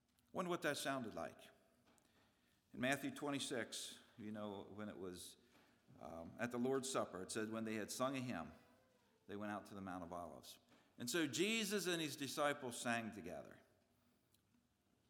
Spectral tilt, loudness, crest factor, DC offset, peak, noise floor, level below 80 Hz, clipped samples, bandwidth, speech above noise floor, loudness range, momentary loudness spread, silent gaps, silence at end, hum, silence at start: -3.5 dB/octave; -45 LUFS; 24 dB; under 0.1%; -24 dBFS; -81 dBFS; -82 dBFS; under 0.1%; 19.5 kHz; 36 dB; 6 LU; 15 LU; none; 1.5 s; none; 0.35 s